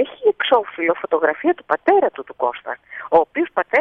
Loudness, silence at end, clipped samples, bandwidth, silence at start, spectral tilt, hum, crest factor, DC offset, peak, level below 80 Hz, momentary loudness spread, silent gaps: -19 LUFS; 0 s; under 0.1%; 4.3 kHz; 0 s; -6 dB/octave; none; 18 dB; under 0.1%; -2 dBFS; -62 dBFS; 8 LU; none